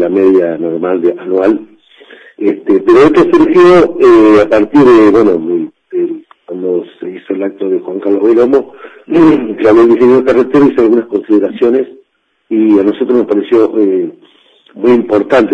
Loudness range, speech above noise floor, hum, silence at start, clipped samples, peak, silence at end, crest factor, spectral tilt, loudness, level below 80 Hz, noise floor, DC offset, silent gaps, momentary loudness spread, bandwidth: 7 LU; 49 dB; none; 0 s; under 0.1%; 0 dBFS; 0 s; 8 dB; -7.5 dB/octave; -9 LUFS; -46 dBFS; -56 dBFS; under 0.1%; none; 12 LU; 7.6 kHz